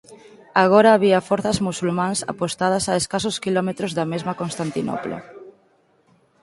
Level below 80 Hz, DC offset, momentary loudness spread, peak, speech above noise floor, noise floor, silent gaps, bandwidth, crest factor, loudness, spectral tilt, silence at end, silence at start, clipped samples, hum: -54 dBFS; under 0.1%; 12 LU; 0 dBFS; 40 dB; -60 dBFS; none; 11.5 kHz; 20 dB; -20 LUFS; -4.5 dB/octave; 0.9 s; 0.1 s; under 0.1%; none